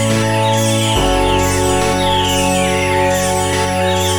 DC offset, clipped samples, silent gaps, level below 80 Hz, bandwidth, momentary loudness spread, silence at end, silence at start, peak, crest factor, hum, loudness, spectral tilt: under 0.1%; under 0.1%; none; -28 dBFS; over 20 kHz; 1 LU; 0 s; 0 s; -2 dBFS; 12 dB; none; -14 LUFS; -4 dB/octave